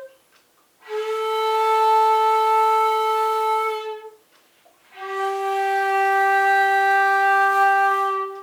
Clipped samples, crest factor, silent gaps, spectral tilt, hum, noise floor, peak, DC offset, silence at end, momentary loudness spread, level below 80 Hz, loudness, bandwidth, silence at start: under 0.1%; 12 dB; none; 0 dB/octave; none; -59 dBFS; -8 dBFS; under 0.1%; 0 s; 11 LU; -82 dBFS; -19 LUFS; 19.5 kHz; 0 s